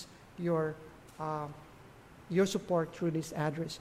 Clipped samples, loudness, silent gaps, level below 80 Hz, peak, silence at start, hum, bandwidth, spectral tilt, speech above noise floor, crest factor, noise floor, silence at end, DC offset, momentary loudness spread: under 0.1%; -34 LUFS; none; -64 dBFS; -18 dBFS; 0 s; none; 15.5 kHz; -6 dB/octave; 22 dB; 18 dB; -55 dBFS; 0 s; under 0.1%; 23 LU